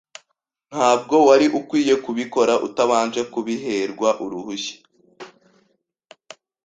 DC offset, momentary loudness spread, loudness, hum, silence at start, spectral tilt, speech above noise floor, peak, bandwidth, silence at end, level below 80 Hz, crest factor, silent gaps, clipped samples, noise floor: under 0.1%; 14 LU; -19 LUFS; none; 0.7 s; -4 dB/octave; 55 dB; -2 dBFS; 9.4 kHz; 1.35 s; -64 dBFS; 20 dB; none; under 0.1%; -73 dBFS